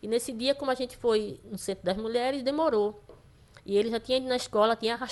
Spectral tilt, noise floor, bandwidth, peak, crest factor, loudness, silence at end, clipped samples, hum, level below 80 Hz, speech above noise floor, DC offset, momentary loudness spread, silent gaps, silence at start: -4 dB/octave; -55 dBFS; 12.5 kHz; -10 dBFS; 18 dB; -29 LUFS; 0 s; under 0.1%; none; -58 dBFS; 27 dB; under 0.1%; 7 LU; none; 0.05 s